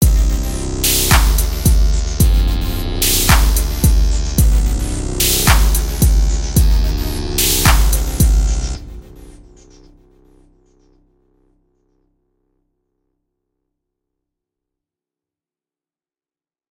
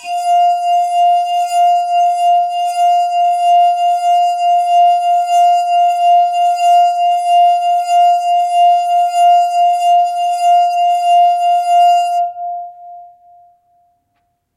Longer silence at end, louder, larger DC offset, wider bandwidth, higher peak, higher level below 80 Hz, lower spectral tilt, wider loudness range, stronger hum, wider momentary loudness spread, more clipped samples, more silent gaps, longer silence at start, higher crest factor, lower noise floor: first, 7.4 s vs 1.5 s; second, -15 LUFS vs -12 LUFS; neither; first, 17 kHz vs 12.5 kHz; first, 0 dBFS vs -4 dBFS; first, -18 dBFS vs -78 dBFS; first, -3.5 dB/octave vs 2 dB/octave; first, 6 LU vs 2 LU; neither; first, 9 LU vs 4 LU; neither; neither; about the same, 0 s vs 0 s; first, 16 dB vs 8 dB; first, under -90 dBFS vs -65 dBFS